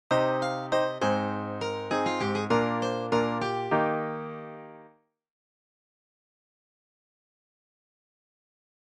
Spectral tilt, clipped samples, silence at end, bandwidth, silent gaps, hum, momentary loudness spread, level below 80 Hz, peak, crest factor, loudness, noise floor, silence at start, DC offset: -5.5 dB/octave; under 0.1%; 4 s; 11 kHz; none; none; 12 LU; -68 dBFS; -10 dBFS; 20 dB; -28 LUFS; -59 dBFS; 0.1 s; under 0.1%